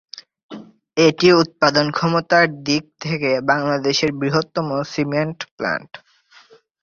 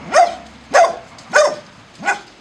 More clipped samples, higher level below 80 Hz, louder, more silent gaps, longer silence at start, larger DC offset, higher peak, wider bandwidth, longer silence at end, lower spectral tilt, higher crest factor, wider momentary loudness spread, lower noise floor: neither; about the same, -58 dBFS vs -56 dBFS; about the same, -18 LUFS vs -16 LUFS; first, 0.43-0.49 s, 5.51-5.58 s vs none; first, 0.15 s vs 0 s; neither; about the same, -2 dBFS vs 0 dBFS; second, 7.4 kHz vs 12 kHz; first, 0.85 s vs 0.2 s; first, -5 dB/octave vs -1.5 dB/octave; about the same, 18 dB vs 16 dB; about the same, 16 LU vs 18 LU; first, -50 dBFS vs -37 dBFS